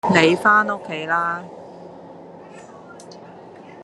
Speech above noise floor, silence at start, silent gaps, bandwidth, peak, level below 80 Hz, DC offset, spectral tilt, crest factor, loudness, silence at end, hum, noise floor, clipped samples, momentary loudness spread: 23 dB; 0.05 s; none; 12.5 kHz; 0 dBFS; -64 dBFS; under 0.1%; -5 dB/octave; 22 dB; -18 LUFS; 0 s; none; -41 dBFS; under 0.1%; 26 LU